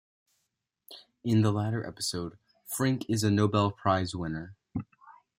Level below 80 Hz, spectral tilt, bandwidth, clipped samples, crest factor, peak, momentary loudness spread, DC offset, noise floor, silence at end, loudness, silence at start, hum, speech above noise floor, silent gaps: -62 dBFS; -5.5 dB/octave; 16.5 kHz; under 0.1%; 20 dB; -10 dBFS; 16 LU; under 0.1%; -82 dBFS; 0.25 s; -30 LUFS; 0.9 s; none; 54 dB; none